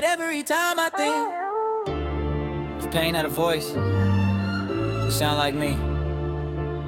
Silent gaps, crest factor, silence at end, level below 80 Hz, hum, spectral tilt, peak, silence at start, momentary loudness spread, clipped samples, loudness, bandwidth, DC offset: none; 18 dB; 0 s; -38 dBFS; none; -5 dB/octave; -6 dBFS; 0 s; 6 LU; under 0.1%; -25 LUFS; 18 kHz; under 0.1%